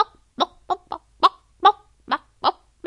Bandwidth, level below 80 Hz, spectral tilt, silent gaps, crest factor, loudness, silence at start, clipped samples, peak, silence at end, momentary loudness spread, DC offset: 11 kHz; -60 dBFS; -3 dB/octave; none; 22 dB; -23 LUFS; 0 s; under 0.1%; 0 dBFS; 0.35 s; 11 LU; under 0.1%